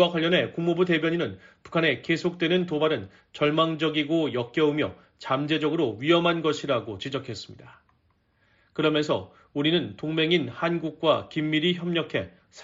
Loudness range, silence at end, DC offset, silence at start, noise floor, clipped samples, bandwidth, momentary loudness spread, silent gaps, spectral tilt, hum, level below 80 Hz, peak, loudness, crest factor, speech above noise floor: 4 LU; 0 s; under 0.1%; 0 s; -67 dBFS; under 0.1%; 7.6 kHz; 9 LU; none; -4 dB/octave; none; -64 dBFS; -8 dBFS; -25 LUFS; 18 dB; 42 dB